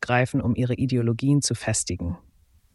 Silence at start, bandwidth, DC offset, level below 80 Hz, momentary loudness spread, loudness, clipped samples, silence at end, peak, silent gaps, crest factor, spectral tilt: 0 s; 12 kHz; under 0.1%; -46 dBFS; 9 LU; -24 LUFS; under 0.1%; 0.6 s; -6 dBFS; none; 18 dB; -5 dB/octave